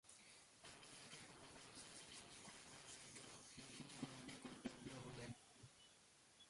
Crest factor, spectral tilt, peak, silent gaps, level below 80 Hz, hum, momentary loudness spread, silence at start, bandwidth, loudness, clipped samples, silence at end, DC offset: 24 dB; -3 dB/octave; -36 dBFS; none; -80 dBFS; none; 11 LU; 0.05 s; 11.5 kHz; -58 LUFS; under 0.1%; 0 s; under 0.1%